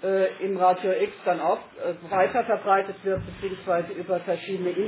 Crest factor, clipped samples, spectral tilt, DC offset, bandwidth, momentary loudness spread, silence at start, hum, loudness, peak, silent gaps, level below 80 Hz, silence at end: 18 dB; under 0.1%; -9.5 dB/octave; under 0.1%; 4 kHz; 7 LU; 0 s; none; -26 LUFS; -8 dBFS; none; -56 dBFS; 0 s